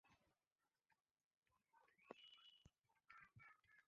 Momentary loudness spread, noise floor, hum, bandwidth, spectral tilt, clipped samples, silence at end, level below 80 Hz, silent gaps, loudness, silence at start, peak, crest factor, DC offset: 5 LU; under -90 dBFS; none; 6.8 kHz; -1.5 dB/octave; under 0.1%; 0 s; under -90 dBFS; 0.52-0.56 s, 1.01-1.05 s, 1.11-1.15 s, 1.24-1.31 s, 1.37-1.42 s; -67 LUFS; 0.05 s; -40 dBFS; 32 dB; under 0.1%